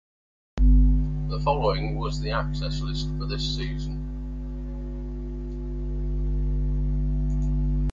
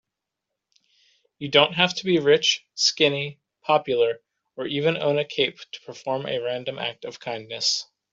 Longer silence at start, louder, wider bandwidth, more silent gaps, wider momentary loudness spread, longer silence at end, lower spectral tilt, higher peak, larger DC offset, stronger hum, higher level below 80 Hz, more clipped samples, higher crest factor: second, 0.55 s vs 1.4 s; second, -28 LUFS vs -23 LUFS; about the same, 7.4 kHz vs 7.8 kHz; neither; second, 12 LU vs 16 LU; second, 0 s vs 0.3 s; first, -7 dB/octave vs -3 dB/octave; second, -10 dBFS vs -2 dBFS; neither; first, 50 Hz at -30 dBFS vs none; first, -26 dBFS vs -68 dBFS; neither; second, 16 dB vs 22 dB